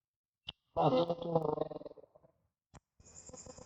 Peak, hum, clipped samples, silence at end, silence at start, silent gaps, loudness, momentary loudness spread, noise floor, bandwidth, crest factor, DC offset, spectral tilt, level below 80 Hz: -18 dBFS; none; under 0.1%; 0.05 s; 0.45 s; none; -34 LUFS; 22 LU; -72 dBFS; 8.6 kHz; 20 dB; under 0.1%; -6.5 dB/octave; -68 dBFS